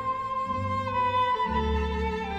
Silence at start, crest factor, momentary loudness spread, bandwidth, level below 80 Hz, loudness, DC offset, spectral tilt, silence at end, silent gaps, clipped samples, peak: 0 s; 12 dB; 5 LU; 8.4 kHz; -36 dBFS; -27 LUFS; under 0.1%; -6.5 dB/octave; 0 s; none; under 0.1%; -16 dBFS